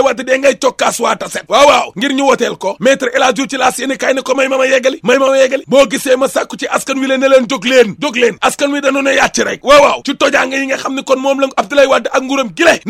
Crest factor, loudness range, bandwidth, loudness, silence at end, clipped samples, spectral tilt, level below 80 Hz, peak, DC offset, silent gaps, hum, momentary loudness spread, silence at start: 12 dB; 1 LU; 15 kHz; -11 LUFS; 0 s; 0.3%; -2.5 dB/octave; -48 dBFS; 0 dBFS; under 0.1%; none; none; 7 LU; 0 s